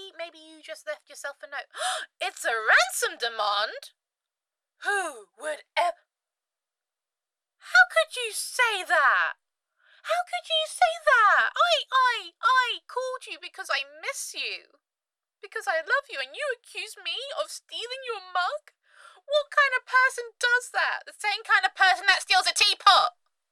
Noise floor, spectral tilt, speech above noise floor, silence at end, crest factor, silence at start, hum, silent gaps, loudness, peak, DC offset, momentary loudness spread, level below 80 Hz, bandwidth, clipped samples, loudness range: under -90 dBFS; 2.5 dB/octave; over 64 dB; 0.4 s; 22 dB; 0 s; none; none; -24 LUFS; -4 dBFS; under 0.1%; 17 LU; -72 dBFS; 15.5 kHz; under 0.1%; 9 LU